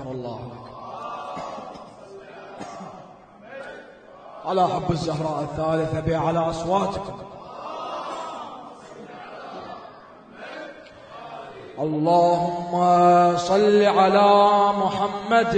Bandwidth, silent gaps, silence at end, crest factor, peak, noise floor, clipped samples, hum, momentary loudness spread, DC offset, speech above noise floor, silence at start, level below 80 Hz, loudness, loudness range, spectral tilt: 9.4 kHz; none; 0 s; 18 dB; -4 dBFS; -46 dBFS; under 0.1%; none; 24 LU; under 0.1%; 26 dB; 0 s; -52 dBFS; -21 LUFS; 20 LU; -6 dB/octave